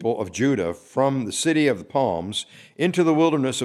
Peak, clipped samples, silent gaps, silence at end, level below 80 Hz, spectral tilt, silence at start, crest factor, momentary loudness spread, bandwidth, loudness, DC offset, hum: -6 dBFS; under 0.1%; none; 0 s; -60 dBFS; -5 dB/octave; 0 s; 16 dB; 8 LU; 13.5 kHz; -22 LUFS; under 0.1%; none